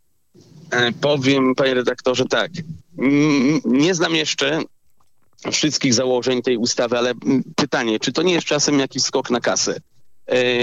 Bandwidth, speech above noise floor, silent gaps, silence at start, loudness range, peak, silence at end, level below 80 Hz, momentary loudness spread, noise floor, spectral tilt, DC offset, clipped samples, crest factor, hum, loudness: 8.8 kHz; 46 dB; none; 0.55 s; 2 LU; -2 dBFS; 0 s; -62 dBFS; 6 LU; -64 dBFS; -3.5 dB/octave; under 0.1%; under 0.1%; 16 dB; none; -18 LUFS